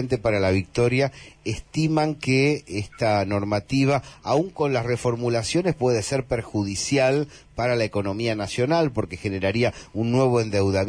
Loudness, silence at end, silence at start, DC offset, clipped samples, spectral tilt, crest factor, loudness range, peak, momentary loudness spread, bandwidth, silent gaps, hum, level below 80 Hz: -23 LUFS; 0 s; 0 s; under 0.1%; under 0.1%; -5.5 dB/octave; 14 dB; 1 LU; -10 dBFS; 7 LU; 10.5 kHz; none; none; -48 dBFS